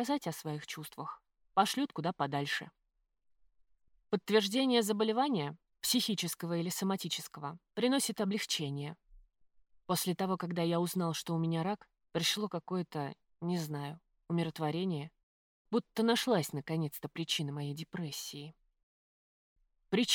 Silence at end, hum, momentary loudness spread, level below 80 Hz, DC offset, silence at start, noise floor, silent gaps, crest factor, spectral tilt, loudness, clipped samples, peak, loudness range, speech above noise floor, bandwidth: 0 s; none; 12 LU; -74 dBFS; under 0.1%; 0 s; -63 dBFS; 15.23-15.65 s, 18.83-19.56 s; 22 dB; -4.5 dB/octave; -35 LUFS; under 0.1%; -14 dBFS; 5 LU; 29 dB; 19.5 kHz